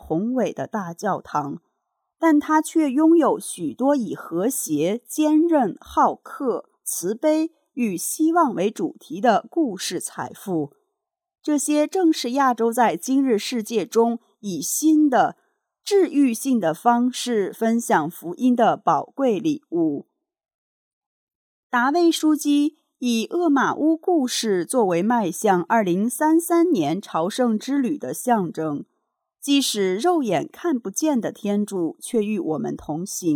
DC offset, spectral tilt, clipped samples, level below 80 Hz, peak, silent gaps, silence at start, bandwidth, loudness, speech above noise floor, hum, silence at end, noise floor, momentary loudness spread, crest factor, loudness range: under 0.1%; -4.5 dB/octave; under 0.1%; -64 dBFS; -6 dBFS; 20.54-21.27 s, 21.35-21.70 s; 0.05 s; 19 kHz; -21 LUFS; 60 dB; none; 0 s; -80 dBFS; 9 LU; 16 dB; 3 LU